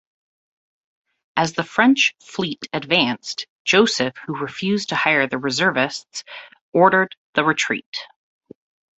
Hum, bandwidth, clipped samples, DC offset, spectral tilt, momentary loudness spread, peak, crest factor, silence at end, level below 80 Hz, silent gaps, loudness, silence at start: none; 8.2 kHz; under 0.1%; under 0.1%; -3.5 dB/octave; 14 LU; -2 dBFS; 20 dB; 0.95 s; -64 dBFS; 3.50-3.65 s, 6.61-6.72 s, 7.17-7.33 s, 7.86-7.93 s; -19 LUFS; 1.35 s